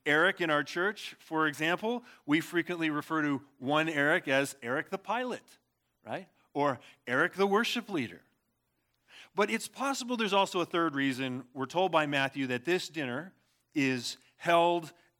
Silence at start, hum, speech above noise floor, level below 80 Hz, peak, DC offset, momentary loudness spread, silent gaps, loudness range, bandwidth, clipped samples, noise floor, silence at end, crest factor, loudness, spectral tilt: 0.05 s; none; 48 dB; -84 dBFS; -12 dBFS; under 0.1%; 12 LU; none; 3 LU; 18 kHz; under 0.1%; -78 dBFS; 0.3 s; 20 dB; -31 LUFS; -4.5 dB/octave